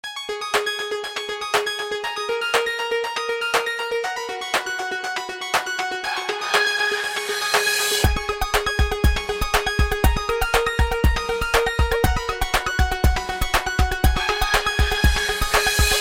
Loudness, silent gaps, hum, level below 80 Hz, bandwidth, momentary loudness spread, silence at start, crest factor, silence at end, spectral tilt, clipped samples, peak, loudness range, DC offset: -21 LUFS; none; none; -26 dBFS; 16.5 kHz; 7 LU; 0.05 s; 18 dB; 0 s; -3 dB/octave; under 0.1%; -4 dBFS; 3 LU; under 0.1%